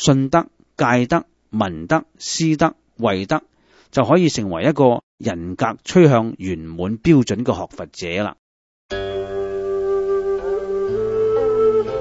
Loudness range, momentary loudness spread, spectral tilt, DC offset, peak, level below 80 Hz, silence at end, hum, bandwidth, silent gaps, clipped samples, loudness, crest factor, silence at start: 5 LU; 11 LU; -6 dB/octave; under 0.1%; 0 dBFS; -46 dBFS; 0 s; none; 8 kHz; 5.03-5.18 s, 8.39-8.89 s; under 0.1%; -19 LUFS; 18 dB; 0 s